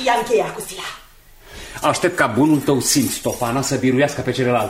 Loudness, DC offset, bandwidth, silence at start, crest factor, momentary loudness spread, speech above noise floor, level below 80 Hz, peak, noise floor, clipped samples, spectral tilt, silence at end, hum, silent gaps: -18 LUFS; under 0.1%; 16 kHz; 0 s; 18 dB; 14 LU; 27 dB; -46 dBFS; -2 dBFS; -45 dBFS; under 0.1%; -4 dB/octave; 0 s; none; none